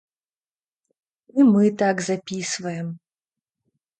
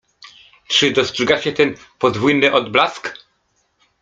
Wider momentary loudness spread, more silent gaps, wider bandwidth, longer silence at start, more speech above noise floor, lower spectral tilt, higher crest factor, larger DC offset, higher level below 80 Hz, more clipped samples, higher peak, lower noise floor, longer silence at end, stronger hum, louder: first, 16 LU vs 6 LU; neither; about the same, 9.2 kHz vs 9.2 kHz; first, 1.35 s vs 0.7 s; first, over 70 dB vs 48 dB; first, -5.5 dB/octave vs -3.5 dB/octave; about the same, 18 dB vs 18 dB; neither; second, -70 dBFS vs -56 dBFS; neither; second, -6 dBFS vs -2 dBFS; first, under -90 dBFS vs -65 dBFS; about the same, 1 s vs 0.9 s; neither; second, -21 LUFS vs -16 LUFS